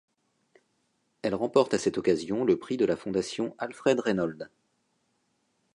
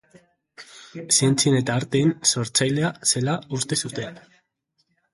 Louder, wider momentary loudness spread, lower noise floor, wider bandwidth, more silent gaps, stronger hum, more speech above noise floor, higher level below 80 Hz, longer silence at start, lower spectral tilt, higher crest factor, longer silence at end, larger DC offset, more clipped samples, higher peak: second, -28 LUFS vs -21 LUFS; second, 9 LU vs 16 LU; about the same, -74 dBFS vs -72 dBFS; about the same, 11 kHz vs 12 kHz; neither; neither; about the same, 47 dB vs 50 dB; second, -66 dBFS vs -60 dBFS; first, 1.25 s vs 0.6 s; first, -5.5 dB/octave vs -3.5 dB/octave; about the same, 20 dB vs 20 dB; first, 1.25 s vs 0.95 s; neither; neither; second, -10 dBFS vs -4 dBFS